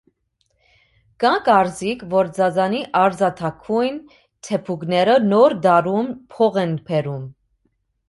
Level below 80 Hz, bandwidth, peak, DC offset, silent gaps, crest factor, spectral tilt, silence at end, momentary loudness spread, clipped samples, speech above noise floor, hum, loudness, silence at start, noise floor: -60 dBFS; 11.5 kHz; -2 dBFS; under 0.1%; none; 18 dB; -6 dB/octave; 0.75 s; 13 LU; under 0.1%; 50 dB; none; -19 LUFS; 1.2 s; -68 dBFS